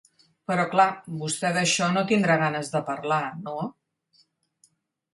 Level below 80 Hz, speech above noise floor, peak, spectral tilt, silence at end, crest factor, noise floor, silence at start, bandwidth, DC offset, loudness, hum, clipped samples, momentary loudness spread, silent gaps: -70 dBFS; 41 dB; -6 dBFS; -4 dB/octave; 1.4 s; 20 dB; -66 dBFS; 0.5 s; 11.5 kHz; under 0.1%; -24 LUFS; none; under 0.1%; 12 LU; none